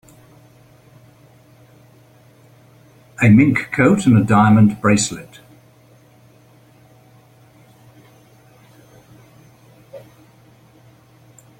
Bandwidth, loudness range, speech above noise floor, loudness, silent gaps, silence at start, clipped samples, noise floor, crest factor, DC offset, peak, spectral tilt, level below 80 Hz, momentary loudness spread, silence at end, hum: 11.5 kHz; 8 LU; 37 dB; -14 LUFS; none; 3.2 s; under 0.1%; -50 dBFS; 20 dB; under 0.1%; 0 dBFS; -6 dB/octave; -52 dBFS; 6 LU; 1.6 s; none